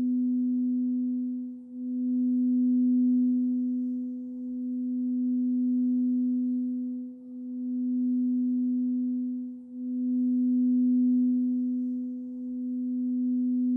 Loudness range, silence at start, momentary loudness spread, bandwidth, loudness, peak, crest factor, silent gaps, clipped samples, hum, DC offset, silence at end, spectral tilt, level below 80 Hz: 2 LU; 0 s; 12 LU; 0.5 kHz; -28 LUFS; -20 dBFS; 8 dB; none; under 0.1%; none; under 0.1%; 0 s; -12 dB/octave; -80 dBFS